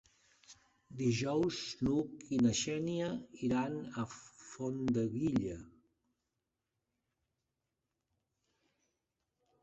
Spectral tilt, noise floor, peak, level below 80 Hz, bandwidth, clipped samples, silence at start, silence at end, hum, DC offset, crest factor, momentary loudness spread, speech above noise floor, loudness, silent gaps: -5.5 dB/octave; -88 dBFS; -20 dBFS; -64 dBFS; 8 kHz; under 0.1%; 0.5 s; 3.95 s; none; under 0.1%; 18 dB; 11 LU; 53 dB; -36 LUFS; none